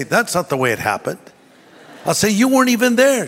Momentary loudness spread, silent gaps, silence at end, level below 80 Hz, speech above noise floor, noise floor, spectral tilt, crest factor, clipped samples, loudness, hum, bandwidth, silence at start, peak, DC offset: 12 LU; none; 0 s; -54 dBFS; 30 dB; -46 dBFS; -4 dB/octave; 16 dB; under 0.1%; -16 LUFS; none; 16.5 kHz; 0 s; -2 dBFS; under 0.1%